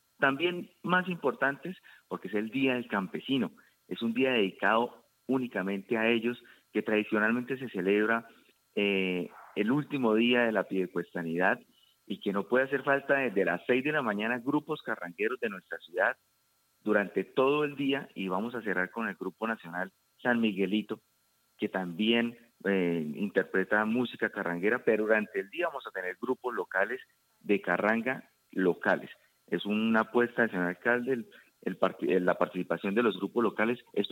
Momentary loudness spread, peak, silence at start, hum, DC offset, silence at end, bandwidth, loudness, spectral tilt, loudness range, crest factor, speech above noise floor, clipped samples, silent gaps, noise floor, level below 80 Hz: 10 LU; -10 dBFS; 0.2 s; none; under 0.1%; 0 s; 16.5 kHz; -30 LUFS; -6.5 dB/octave; 3 LU; 20 dB; 42 dB; under 0.1%; none; -72 dBFS; -82 dBFS